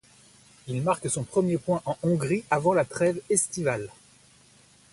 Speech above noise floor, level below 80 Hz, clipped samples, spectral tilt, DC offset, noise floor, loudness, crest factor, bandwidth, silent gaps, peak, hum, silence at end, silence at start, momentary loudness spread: 31 dB; -60 dBFS; under 0.1%; -5.5 dB/octave; under 0.1%; -57 dBFS; -26 LUFS; 20 dB; 11.5 kHz; none; -8 dBFS; none; 1 s; 0.65 s; 8 LU